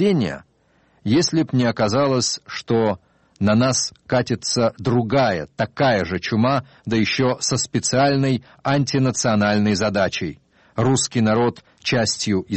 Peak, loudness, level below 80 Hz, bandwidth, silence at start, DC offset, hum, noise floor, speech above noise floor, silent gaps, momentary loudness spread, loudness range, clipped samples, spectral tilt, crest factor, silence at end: -6 dBFS; -20 LUFS; -52 dBFS; 8.8 kHz; 0 s; under 0.1%; none; -60 dBFS; 40 dB; none; 6 LU; 1 LU; under 0.1%; -4.5 dB/octave; 14 dB; 0 s